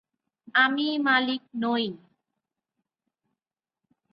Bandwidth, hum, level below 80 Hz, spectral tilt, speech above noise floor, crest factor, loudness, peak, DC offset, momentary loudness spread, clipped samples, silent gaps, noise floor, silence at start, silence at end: 5.8 kHz; none; -78 dBFS; -6.5 dB/octave; over 65 dB; 20 dB; -25 LUFS; -10 dBFS; under 0.1%; 8 LU; under 0.1%; none; under -90 dBFS; 0.45 s; 2.15 s